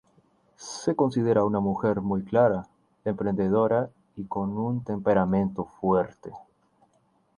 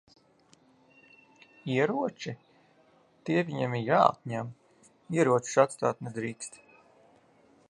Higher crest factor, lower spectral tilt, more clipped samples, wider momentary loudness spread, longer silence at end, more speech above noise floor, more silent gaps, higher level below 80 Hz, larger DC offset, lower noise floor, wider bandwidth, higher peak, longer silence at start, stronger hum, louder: second, 18 dB vs 26 dB; first, -7.5 dB/octave vs -5.5 dB/octave; neither; second, 12 LU vs 18 LU; second, 0.95 s vs 1.15 s; first, 42 dB vs 35 dB; neither; first, -56 dBFS vs -74 dBFS; neither; first, -67 dBFS vs -63 dBFS; about the same, 10.5 kHz vs 11.5 kHz; about the same, -8 dBFS vs -6 dBFS; second, 0.6 s vs 1.65 s; neither; first, -26 LUFS vs -29 LUFS